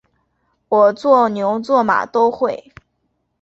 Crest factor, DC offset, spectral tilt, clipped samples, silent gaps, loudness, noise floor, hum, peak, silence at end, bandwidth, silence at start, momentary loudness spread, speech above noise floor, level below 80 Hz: 16 dB; under 0.1%; -6.5 dB/octave; under 0.1%; none; -16 LUFS; -69 dBFS; none; -2 dBFS; 0.85 s; 8 kHz; 0.7 s; 8 LU; 54 dB; -60 dBFS